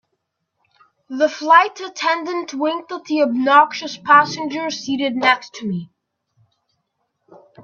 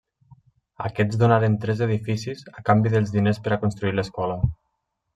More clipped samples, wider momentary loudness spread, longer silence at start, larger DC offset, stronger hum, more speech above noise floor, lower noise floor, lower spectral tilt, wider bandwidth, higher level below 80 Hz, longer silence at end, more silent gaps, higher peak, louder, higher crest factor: neither; first, 13 LU vs 10 LU; first, 1.1 s vs 0.3 s; neither; neither; about the same, 57 dB vs 55 dB; about the same, -74 dBFS vs -76 dBFS; second, -4 dB/octave vs -8 dB/octave; second, 7.4 kHz vs 8.8 kHz; second, -70 dBFS vs -46 dBFS; second, 0 s vs 0.6 s; neither; first, 0 dBFS vs -4 dBFS; first, -17 LUFS vs -23 LUFS; about the same, 20 dB vs 20 dB